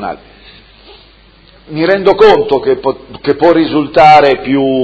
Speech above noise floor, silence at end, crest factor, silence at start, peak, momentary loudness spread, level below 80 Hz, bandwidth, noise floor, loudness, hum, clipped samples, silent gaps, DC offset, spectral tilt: 33 dB; 0 s; 10 dB; 0 s; 0 dBFS; 14 LU; -42 dBFS; 8 kHz; -42 dBFS; -9 LUFS; none; 2%; none; under 0.1%; -6.5 dB/octave